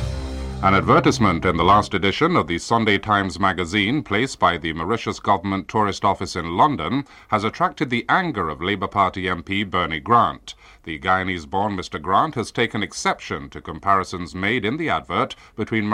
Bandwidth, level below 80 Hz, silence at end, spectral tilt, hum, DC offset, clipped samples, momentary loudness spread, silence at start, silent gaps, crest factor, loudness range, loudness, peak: 14 kHz; -42 dBFS; 0 s; -5 dB/octave; none; under 0.1%; under 0.1%; 10 LU; 0 s; none; 18 dB; 5 LU; -21 LUFS; -2 dBFS